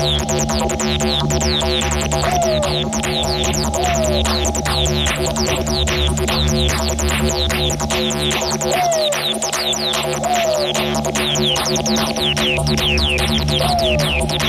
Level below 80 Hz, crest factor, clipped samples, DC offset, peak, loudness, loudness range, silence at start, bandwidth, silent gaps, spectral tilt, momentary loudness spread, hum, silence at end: -26 dBFS; 14 dB; under 0.1%; under 0.1%; -4 dBFS; -17 LUFS; 1 LU; 0 s; 15.5 kHz; none; -3.5 dB/octave; 2 LU; none; 0 s